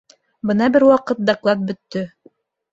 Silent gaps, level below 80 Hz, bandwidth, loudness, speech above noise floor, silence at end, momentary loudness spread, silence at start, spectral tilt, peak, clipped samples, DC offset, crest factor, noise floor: none; -60 dBFS; 7.8 kHz; -18 LUFS; 37 dB; 0.65 s; 14 LU; 0.45 s; -7 dB/octave; -2 dBFS; under 0.1%; under 0.1%; 16 dB; -54 dBFS